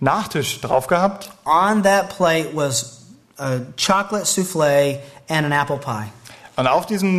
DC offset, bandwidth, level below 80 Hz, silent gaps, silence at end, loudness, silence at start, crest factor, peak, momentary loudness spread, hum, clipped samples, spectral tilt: under 0.1%; 14 kHz; -54 dBFS; none; 0 s; -19 LUFS; 0 s; 16 dB; -4 dBFS; 12 LU; none; under 0.1%; -4 dB/octave